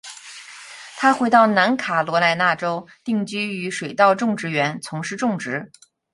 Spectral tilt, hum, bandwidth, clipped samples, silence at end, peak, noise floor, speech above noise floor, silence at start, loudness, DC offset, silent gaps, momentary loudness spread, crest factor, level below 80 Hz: -4.5 dB/octave; none; 11.5 kHz; under 0.1%; 0.45 s; -2 dBFS; -40 dBFS; 20 dB; 0.05 s; -20 LUFS; under 0.1%; none; 21 LU; 20 dB; -68 dBFS